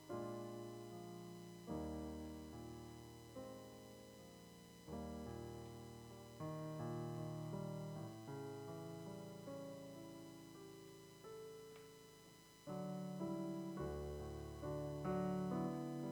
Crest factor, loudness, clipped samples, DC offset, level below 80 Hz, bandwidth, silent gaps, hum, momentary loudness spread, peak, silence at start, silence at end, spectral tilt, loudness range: 18 dB; -50 LUFS; under 0.1%; under 0.1%; -64 dBFS; over 20 kHz; none; none; 14 LU; -32 dBFS; 0 s; 0 s; -7 dB/octave; 8 LU